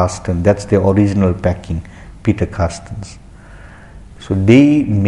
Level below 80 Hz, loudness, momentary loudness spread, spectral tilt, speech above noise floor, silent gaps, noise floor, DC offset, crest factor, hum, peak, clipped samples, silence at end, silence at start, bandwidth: -30 dBFS; -14 LUFS; 17 LU; -7.5 dB/octave; 23 dB; none; -37 dBFS; under 0.1%; 14 dB; none; 0 dBFS; under 0.1%; 0 s; 0 s; 11 kHz